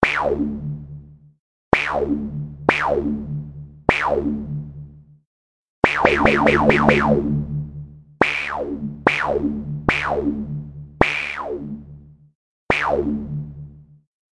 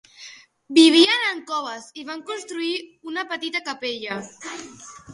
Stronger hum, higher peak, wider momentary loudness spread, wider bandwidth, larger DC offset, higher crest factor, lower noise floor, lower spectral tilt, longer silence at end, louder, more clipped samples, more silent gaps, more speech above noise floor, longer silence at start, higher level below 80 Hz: neither; about the same, 0 dBFS vs 0 dBFS; second, 19 LU vs 24 LU; about the same, 11 kHz vs 11.5 kHz; neither; about the same, 22 dB vs 22 dB; about the same, -43 dBFS vs -45 dBFS; first, -6.5 dB/octave vs -2 dB/octave; first, 0.5 s vs 0 s; about the same, -20 LUFS vs -21 LUFS; neither; first, 1.39-1.72 s, 5.25-5.82 s, 12.35-12.67 s vs none; about the same, 25 dB vs 23 dB; second, 0 s vs 0.2 s; first, -40 dBFS vs -70 dBFS